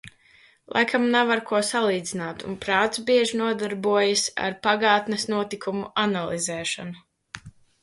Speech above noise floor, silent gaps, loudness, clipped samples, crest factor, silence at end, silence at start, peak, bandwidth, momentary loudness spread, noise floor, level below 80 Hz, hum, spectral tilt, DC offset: 33 dB; none; -23 LUFS; under 0.1%; 18 dB; 0.35 s; 0.05 s; -6 dBFS; 11.5 kHz; 12 LU; -57 dBFS; -62 dBFS; none; -3 dB/octave; under 0.1%